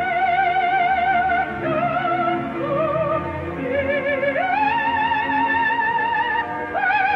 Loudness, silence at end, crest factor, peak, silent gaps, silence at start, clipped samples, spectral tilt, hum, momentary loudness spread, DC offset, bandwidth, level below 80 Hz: -20 LUFS; 0 s; 12 dB; -8 dBFS; none; 0 s; under 0.1%; -7 dB/octave; none; 5 LU; under 0.1%; 6.2 kHz; -48 dBFS